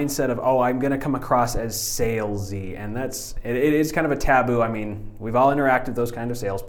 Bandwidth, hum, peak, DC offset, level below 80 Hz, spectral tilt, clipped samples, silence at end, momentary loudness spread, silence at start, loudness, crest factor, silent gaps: 19.5 kHz; none; -4 dBFS; under 0.1%; -36 dBFS; -5 dB/octave; under 0.1%; 0 s; 11 LU; 0 s; -23 LUFS; 18 dB; none